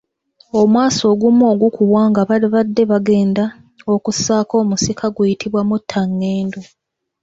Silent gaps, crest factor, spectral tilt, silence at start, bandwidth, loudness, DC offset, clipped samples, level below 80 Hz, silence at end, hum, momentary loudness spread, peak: none; 12 dB; -5.5 dB/octave; 0.55 s; 8 kHz; -15 LUFS; under 0.1%; under 0.1%; -52 dBFS; 0.6 s; none; 7 LU; -2 dBFS